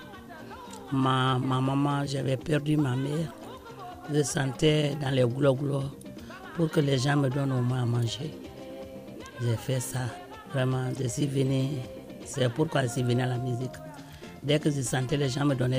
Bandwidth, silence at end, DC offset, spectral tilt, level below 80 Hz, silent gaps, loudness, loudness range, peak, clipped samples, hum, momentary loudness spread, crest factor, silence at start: 15.5 kHz; 0 s; under 0.1%; -6 dB/octave; -56 dBFS; none; -28 LUFS; 4 LU; -12 dBFS; under 0.1%; none; 18 LU; 16 dB; 0 s